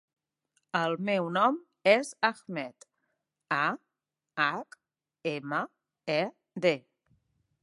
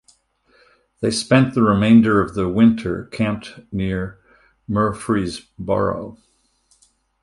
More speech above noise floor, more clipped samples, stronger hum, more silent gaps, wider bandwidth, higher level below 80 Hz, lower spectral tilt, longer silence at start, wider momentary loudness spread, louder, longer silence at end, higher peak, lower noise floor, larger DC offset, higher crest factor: first, 59 dB vs 43 dB; neither; neither; neither; about the same, 11.5 kHz vs 11.5 kHz; second, -84 dBFS vs -44 dBFS; second, -5 dB/octave vs -6.5 dB/octave; second, 0.75 s vs 1 s; about the same, 16 LU vs 17 LU; second, -30 LUFS vs -19 LUFS; second, 0.85 s vs 1.1 s; second, -8 dBFS vs 0 dBFS; first, -88 dBFS vs -61 dBFS; neither; first, 24 dB vs 18 dB